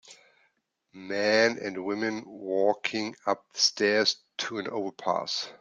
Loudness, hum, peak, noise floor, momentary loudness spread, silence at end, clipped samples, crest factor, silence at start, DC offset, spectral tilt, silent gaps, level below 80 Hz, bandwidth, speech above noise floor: -28 LUFS; none; -8 dBFS; -73 dBFS; 11 LU; 0.05 s; under 0.1%; 20 dB; 0.05 s; under 0.1%; -2.5 dB/octave; none; -76 dBFS; 11 kHz; 45 dB